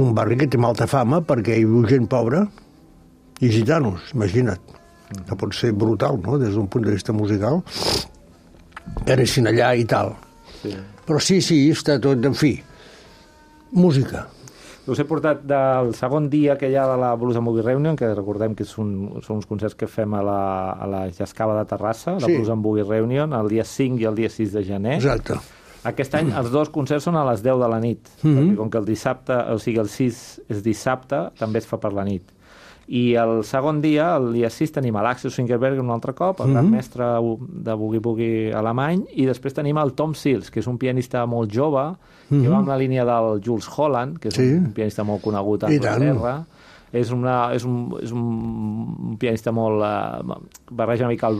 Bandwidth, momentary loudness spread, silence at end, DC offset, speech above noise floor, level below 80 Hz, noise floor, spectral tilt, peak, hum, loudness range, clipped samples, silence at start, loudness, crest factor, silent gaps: 14.5 kHz; 10 LU; 0 s; under 0.1%; 29 dB; -48 dBFS; -49 dBFS; -7 dB/octave; -4 dBFS; none; 4 LU; under 0.1%; 0 s; -21 LUFS; 18 dB; none